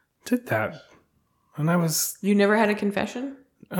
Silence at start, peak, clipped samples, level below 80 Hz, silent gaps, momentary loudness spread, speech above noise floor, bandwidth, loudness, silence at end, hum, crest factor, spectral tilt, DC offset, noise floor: 0.25 s; -8 dBFS; under 0.1%; -64 dBFS; none; 13 LU; 44 dB; 19 kHz; -24 LUFS; 0 s; none; 16 dB; -5 dB/octave; under 0.1%; -68 dBFS